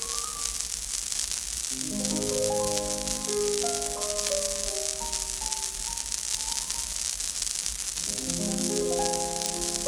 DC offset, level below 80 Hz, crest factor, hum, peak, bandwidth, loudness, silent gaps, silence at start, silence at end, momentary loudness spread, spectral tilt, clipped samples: under 0.1%; -46 dBFS; 24 dB; none; -6 dBFS; 19 kHz; -28 LUFS; none; 0 s; 0 s; 3 LU; -1.5 dB/octave; under 0.1%